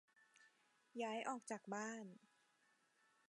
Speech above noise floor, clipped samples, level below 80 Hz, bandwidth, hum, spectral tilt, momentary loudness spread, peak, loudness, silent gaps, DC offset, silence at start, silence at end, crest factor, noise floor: 32 dB; under 0.1%; under -90 dBFS; 11 kHz; none; -3.5 dB/octave; 13 LU; -32 dBFS; -48 LUFS; none; under 0.1%; 0.2 s; 1.15 s; 20 dB; -80 dBFS